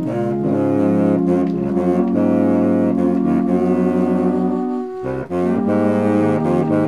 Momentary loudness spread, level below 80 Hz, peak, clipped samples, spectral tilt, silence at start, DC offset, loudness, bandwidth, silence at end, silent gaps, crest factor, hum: 5 LU; -50 dBFS; -4 dBFS; under 0.1%; -9.5 dB/octave; 0 s; 0.3%; -17 LUFS; 10.5 kHz; 0 s; none; 12 dB; none